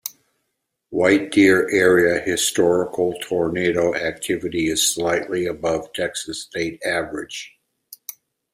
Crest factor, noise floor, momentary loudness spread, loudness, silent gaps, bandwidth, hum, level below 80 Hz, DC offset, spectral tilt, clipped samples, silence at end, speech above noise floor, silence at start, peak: 18 dB; -76 dBFS; 16 LU; -20 LUFS; none; 16 kHz; none; -54 dBFS; under 0.1%; -3.5 dB/octave; under 0.1%; 1.05 s; 56 dB; 0.05 s; -2 dBFS